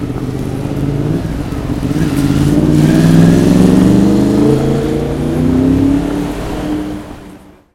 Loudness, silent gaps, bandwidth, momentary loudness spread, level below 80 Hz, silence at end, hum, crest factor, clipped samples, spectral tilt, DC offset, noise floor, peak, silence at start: -12 LUFS; none; 16 kHz; 11 LU; -26 dBFS; 0.35 s; none; 12 dB; 0.1%; -7.5 dB/octave; under 0.1%; -36 dBFS; 0 dBFS; 0 s